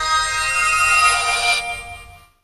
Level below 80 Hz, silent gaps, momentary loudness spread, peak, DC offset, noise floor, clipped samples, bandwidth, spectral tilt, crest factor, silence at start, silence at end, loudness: -42 dBFS; none; 15 LU; -2 dBFS; under 0.1%; -41 dBFS; under 0.1%; 15 kHz; 1 dB/octave; 16 dB; 0 s; 0.25 s; -15 LUFS